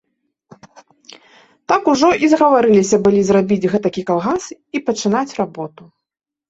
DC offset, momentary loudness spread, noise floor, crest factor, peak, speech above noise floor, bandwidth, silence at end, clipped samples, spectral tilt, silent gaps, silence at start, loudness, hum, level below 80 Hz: under 0.1%; 11 LU; -83 dBFS; 16 dB; -2 dBFS; 68 dB; 8 kHz; 0.85 s; under 0.1%; -5.5 dB/octave; none; 1.7 s; -15 LUFS; none; -54 dBFS